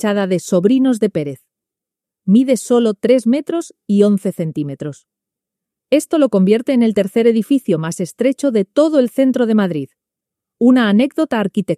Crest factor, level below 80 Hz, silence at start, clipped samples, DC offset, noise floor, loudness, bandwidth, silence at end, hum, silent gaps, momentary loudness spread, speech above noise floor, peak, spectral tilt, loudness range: 14 dB; -64 dBFS; 0 s; under 0.1%; under 0.1%; -85 dBFS; -15 LUFS; 14.5 kHz; 0 s; none; none; 10 LU; 71 dB; 0 dBFS; -6.5 dB/octave; 2 LU